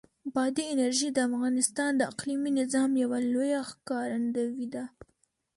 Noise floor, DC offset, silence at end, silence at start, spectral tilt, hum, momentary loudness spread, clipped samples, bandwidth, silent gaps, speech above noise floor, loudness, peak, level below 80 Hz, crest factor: -73 dBFS; under 0.1%; 0.7 s; 0.25 s; -3 dB/octave; none; 8 LU; under 0.1%; 11.5 kHz; none; 44 dB; -29 LUFS; -10 dBFS; -72 dBFS; 18 dB